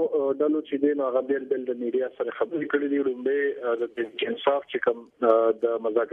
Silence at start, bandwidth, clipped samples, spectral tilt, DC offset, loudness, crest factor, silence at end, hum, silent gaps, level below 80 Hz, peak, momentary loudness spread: 0 s; 3.9 kHz; under 0.1%; -7 dB/octave; under 0.1%; -26 LUFS; 18 dB; 0 s; none; none; -76 dBFS; -6 dBFS; 7 LU